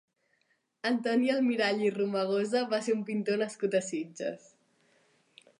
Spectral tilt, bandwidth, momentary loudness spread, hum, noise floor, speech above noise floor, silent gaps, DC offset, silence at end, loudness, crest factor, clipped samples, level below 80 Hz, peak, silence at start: -5 dB/octave; 11 kHz; 9 LU; none; -74 dBFS; 45 dB; none; under 0.1%; 1.2 s; -30 LUFS; 16 dB; under 0.1%; -86 dBFS; -16 dBFS; 0.85 s